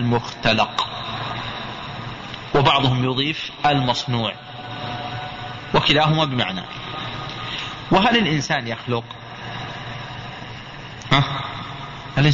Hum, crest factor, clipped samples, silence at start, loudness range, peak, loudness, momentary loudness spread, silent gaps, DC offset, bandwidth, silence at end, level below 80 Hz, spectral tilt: none; 20 dB; under 0.1%; 0 s; 5 LU; -2 dBFS; -21 LUFS; 16 LU; none; under 0.1%; 7.8 kHz; 0 s; -46 dBFS; -5.5 dB/octave